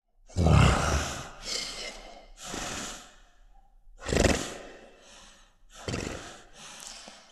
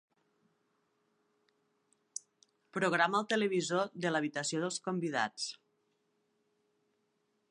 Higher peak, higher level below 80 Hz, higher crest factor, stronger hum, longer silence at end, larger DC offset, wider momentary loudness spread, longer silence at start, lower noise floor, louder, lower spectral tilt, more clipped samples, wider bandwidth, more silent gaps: first, -8 dBFS vs -16 dBFS; first, -38 dBFS vs -86 dBFS; about the same, 24 dB vs 22 dB; neither; second, 0.15 s vs 2 s; neither; first, 23 LU vs 15 LU; second, 0.3 s vs 2.75 s; second, -56 dBFS vs -79 dBFS; first, -29 LUFS vs -33 LUFS; about the same, -4.5 dB/octave vs -4 dB/octave; neither; first, 13.5 kHz vs 11 kHz; neither